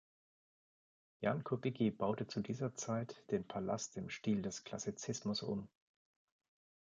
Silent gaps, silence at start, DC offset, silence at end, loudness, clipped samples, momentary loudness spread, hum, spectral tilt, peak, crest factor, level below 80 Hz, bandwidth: none; 1.2 s; under 0.1%; 1.15 s; -41 LUFS; under 0.1%; 7 LU; none; -5.5 dB/octave; -22 dBFS; 20 dB; -72 dBFS; 9.4 kHz